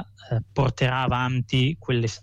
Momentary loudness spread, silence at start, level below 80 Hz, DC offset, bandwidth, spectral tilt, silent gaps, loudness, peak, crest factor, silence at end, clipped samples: 6 LU; 0 s; -46 dBFS; under 0.1%; 7.8 kHz; -6 dB/octave; none; -24 LUFS; -12 dBFS; 14 dB; 0.05 s; under 0.1%